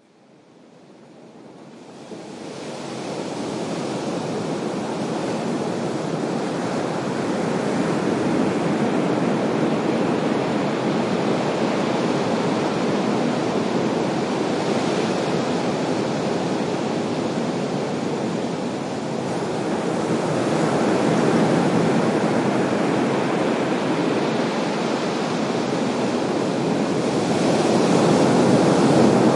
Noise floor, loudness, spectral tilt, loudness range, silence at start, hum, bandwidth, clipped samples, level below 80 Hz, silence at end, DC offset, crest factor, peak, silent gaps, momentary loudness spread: -52 dBFS; -22 LUFS; -6 dB/octave; 7 LU; 0.9 s; none; 11.5 kHz; under 0.1%; -62 dBFS; 0 s; under 0.1%; 18 dB; -4 dBFS; none; 8 LU